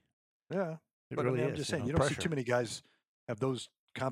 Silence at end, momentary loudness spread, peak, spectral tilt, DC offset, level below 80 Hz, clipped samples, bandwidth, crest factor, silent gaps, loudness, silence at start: 0 s; 13 LU; -16 dBFS; -5.5 dB/octave; under 0.1%; -60 dBFS; under 0.1%; 15 kHz; 20 dB; 0.93-1.10 s, 3.08-3.27 s, 3.78-3.88 s; -35 LUFS; 0.5 s